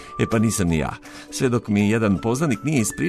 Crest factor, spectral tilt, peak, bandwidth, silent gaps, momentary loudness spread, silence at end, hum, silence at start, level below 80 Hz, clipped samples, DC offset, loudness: 16 dB; -5.5 dB/octave; -6 dBFS; 13.5 kHz; none; 7 LU; 0 s; none; 0 s; -42 dBFS; under 0.1%; under 0.1%; -21 LUFS